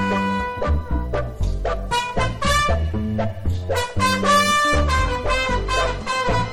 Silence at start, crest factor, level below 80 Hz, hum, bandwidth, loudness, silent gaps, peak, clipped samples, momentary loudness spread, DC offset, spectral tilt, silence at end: 0 s; 16 dB; -28 dBFS; none; 16.5 kHz; -21 LUFS; none; -4 dBFS; under 0.1%; 9 LU; under 0.1%; -4.5 dB/octave; 0 s